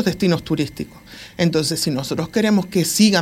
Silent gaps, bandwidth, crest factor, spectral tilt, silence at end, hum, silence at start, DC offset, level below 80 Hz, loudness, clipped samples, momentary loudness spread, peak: none; 16.5 kHz; 18 dB; -4.5 dB/octave; 0 s; none; 0 s; under 0.1%; -48 dBFS; -19 LUFS; under 0.1%; 17 LU; -2 dBFS